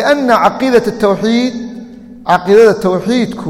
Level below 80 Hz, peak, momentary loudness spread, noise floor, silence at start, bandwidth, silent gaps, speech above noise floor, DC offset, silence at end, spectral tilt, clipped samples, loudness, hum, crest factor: -46 dBFS; 0 dBFS; 17 LU; -31 dBFS; 0 s; 15.5 kHz; none; 20 dB; under 0.1%; 0 s; -5.5 dB/octave; under 0.1%; -11 LUFS; none; 12 dB